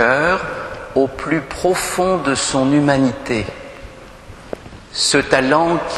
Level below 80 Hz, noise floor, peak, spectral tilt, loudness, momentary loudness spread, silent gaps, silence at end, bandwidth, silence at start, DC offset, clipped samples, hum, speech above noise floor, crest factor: -42 dBFS; -37 dBFS; 0 dBFS; -4 dB/octave; -17 LUFS; 19 LU; none; 0 s; 12.5 kHz; 0 s; under 0.1%; under 0.1%; none; 21 dB; 18 dB